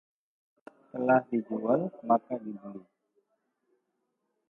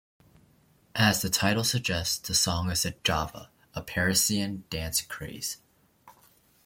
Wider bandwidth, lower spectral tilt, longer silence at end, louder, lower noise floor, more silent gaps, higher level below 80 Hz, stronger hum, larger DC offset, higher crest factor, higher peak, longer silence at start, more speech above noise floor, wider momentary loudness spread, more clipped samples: second, 3.7 kHz vs 16.5 kHz; first, -11 dB/octave vs -3 dB/octave; first, 1.7 s vs 0.55 s; about the same, -29 LUFS vs -27 LUFS; first, -80 dBFS vs -63 dBFS; neither; second, -80 dBFS vs -52 dBFS; neither; neither; about the same, 20 dB vs 24 dB; second, -12 dBFS vs -6 dBFS; about the same, 0.95 s vs 0.95 s; first, 51 dB vs 35 dB; first, 18 LU vs 14 LU; neither